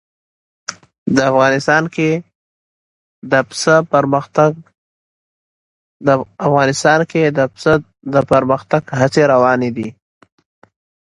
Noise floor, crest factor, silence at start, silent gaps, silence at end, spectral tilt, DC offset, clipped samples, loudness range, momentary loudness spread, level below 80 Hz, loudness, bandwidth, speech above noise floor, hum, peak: under -90 dBFS; 16 dB; 0.7 s; 0.98-1.06 s, 2.35-3.22 s, 4.78-6.00 s; 1.15 s; -5.5 dB/octave; under 0.1%; under 0.1%; 3 LU; 12 LU; -52 dBFS; -14 LUFS; 11.5 kHz; over 76 dB; none; 0 dBFS